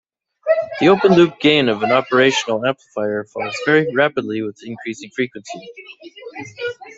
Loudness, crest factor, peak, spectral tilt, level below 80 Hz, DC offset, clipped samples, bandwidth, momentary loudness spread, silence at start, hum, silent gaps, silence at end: -17 LUFS; 16 dB; -2 dBFS; -5 dB/octave; -60 dBFS; under 0.1%; under 0.1%; 8 kHz; 20 LU; 0.45 s; none; none; 0.05 s